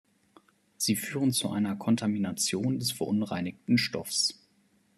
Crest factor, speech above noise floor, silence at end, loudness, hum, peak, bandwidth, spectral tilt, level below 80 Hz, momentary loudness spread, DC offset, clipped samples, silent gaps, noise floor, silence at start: 16 dB; 38 dB; 0.65 s; -29 LUFS; none; -14 dBFS; 13.5 kHz; -4 dB/octave; -70 dBFS; 3 LU; under 0.1%; under 0.1%; none; -67 dBFS; 0.8 s